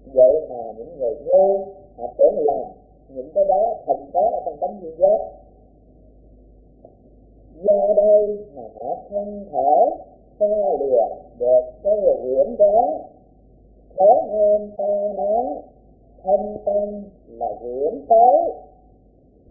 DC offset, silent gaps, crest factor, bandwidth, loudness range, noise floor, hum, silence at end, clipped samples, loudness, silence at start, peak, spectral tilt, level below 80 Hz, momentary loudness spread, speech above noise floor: under 0.1%; none; 18 dB; 0.9 kHz; 5 LU; -53 dBFS; none; 0.9 s; under 0.1%; -19 LUFS; 0.05 s; -2 dBFS; -15.5 dB/octave; -52 dBFS; 17 LU; 34 dB